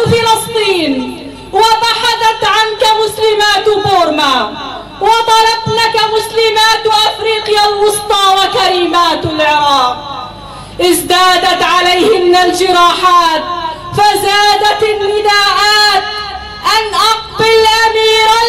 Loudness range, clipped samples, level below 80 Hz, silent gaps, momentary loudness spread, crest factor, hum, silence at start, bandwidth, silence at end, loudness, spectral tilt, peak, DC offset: 2 LU; under 0.1%; -40 dBFS; none; 10 LU; 10 dB; none; 0 s; 16 kHz; 0 s; -9 LUFS; -2.5 dB/octave; 0 dBFS; 0.4%